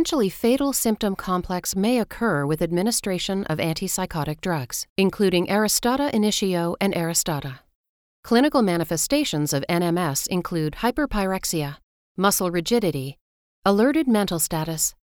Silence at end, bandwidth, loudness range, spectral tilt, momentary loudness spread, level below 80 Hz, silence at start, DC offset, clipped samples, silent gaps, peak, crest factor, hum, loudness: 0.15 s; 20 kHz; 2 LU; -4.5 dB/octave; 7 LU; -46 dBFS; 0 s; under 0.1%; under 0.1%; 4.89-4.96 s, 7.75-8.23 s, 11.83-12.15 s, 13.21-13.62 s; -4 dBFS; 18 dB; none; -22 LUFS